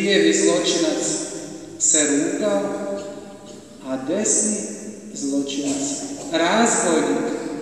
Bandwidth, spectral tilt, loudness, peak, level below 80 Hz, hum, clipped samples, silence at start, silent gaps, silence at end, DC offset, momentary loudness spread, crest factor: 12.5 kHz; -2.5 dB/octave; -20 LUFS; -4 dBFS; -60 dBFS; none; under 0.1%; 0 s; none; 0 s; 0.1%; 17 LU; 18 dB